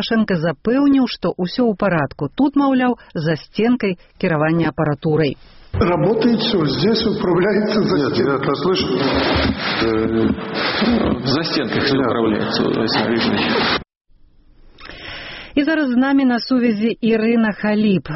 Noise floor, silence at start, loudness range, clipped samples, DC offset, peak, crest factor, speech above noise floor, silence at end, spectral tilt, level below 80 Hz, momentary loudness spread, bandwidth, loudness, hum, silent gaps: -48 dBFS; 0 s; 3 LU; under 0.1%; under 0.1%; -4 dBFS; 14 dB; 32 dB; 0 s; -4.5 dB/octave; -40 dBFS; 6 LU; 6 kHz; -17 LUFS; none; 13.97-14.01 s